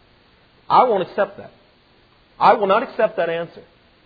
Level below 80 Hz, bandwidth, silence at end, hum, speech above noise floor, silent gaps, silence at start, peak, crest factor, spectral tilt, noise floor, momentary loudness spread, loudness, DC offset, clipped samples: -62 dBFS; 5 kHz; 0.45 s; none; 37 dB; none; 0.7 s; -2 dBFS; 20 dB; -7.5 dB/octave; -55 dBFS; 10 LU; -18 LUFS; under 0.1%; under 0.1%